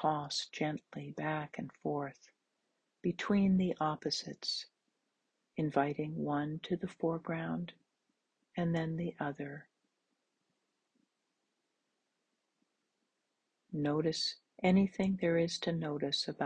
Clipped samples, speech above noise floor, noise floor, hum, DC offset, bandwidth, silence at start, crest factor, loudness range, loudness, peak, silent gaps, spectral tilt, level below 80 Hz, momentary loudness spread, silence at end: under 0.1%; 50 dB; -85 dBFS; none; under 0.1%; 9.4 kHz; 0 s; 20 dB; 7 LU; -36 LUFS; -16 dBFS; none; -5.5 dB/octave; -70 dBFS; 13 LU; 0 s